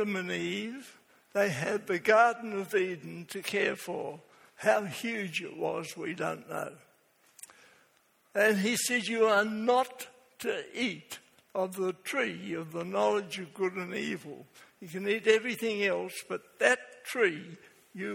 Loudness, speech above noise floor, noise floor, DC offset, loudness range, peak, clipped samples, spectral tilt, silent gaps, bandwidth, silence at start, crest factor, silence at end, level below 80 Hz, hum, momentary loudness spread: -31 LUFS; 37 dB; -68 dBFS; under 0.1%; 5 LU; -6 dBFS; under 0.1%; -4 dB/octave; none; 17.5 kHz; 0 s; 24 dB; 0 s; -78 dBFS; none; 17 LU